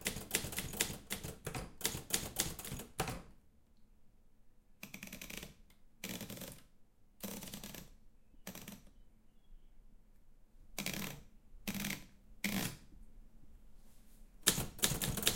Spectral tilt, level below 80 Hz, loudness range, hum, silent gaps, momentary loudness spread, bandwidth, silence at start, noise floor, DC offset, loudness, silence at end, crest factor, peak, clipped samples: -2.5 dB/octave; -56 dBFS; 12 LU; none; none; 18 LU; 17 kHz; 0 s; -63 dBFS; under 0.1%; -40 LUFS; 0 s; 36 dB; -6 dBFS; under 0.1%